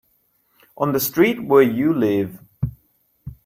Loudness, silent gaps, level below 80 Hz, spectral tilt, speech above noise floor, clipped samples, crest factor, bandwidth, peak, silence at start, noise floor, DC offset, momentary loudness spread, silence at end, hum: -19 LUFS; none; -48 dBFS; -6 dB/octave; 47 dB; under 0.1%; 18 dB; 16.5 kHz; -2 dBFS; 0.8 s; -64 dBFS; under 0.1%; 14 LU; 0.1 s; none